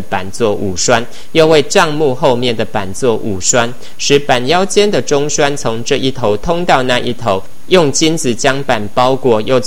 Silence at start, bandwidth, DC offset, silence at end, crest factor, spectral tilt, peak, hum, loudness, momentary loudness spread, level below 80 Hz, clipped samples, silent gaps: 0 s; 17 kHz; 10%; 0 s; 14 dB; -3.5 dB/octave; 0 dBFS; none; -13 LUFS; 6 LU; -38 dBFS; 0.5%; none